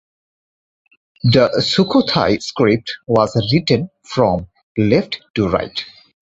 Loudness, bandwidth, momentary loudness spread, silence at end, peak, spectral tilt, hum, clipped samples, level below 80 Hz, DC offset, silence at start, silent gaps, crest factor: -17 LUFS; 8 kHz; 10 LU; 0.35 s; 0 dBFS; -6.5 dB/octave; none; under 0.1%; -44 dBFS; under 0.1%; 1.25 s; 4.63-4.75 s, 5.30-5.34 s; 16 dB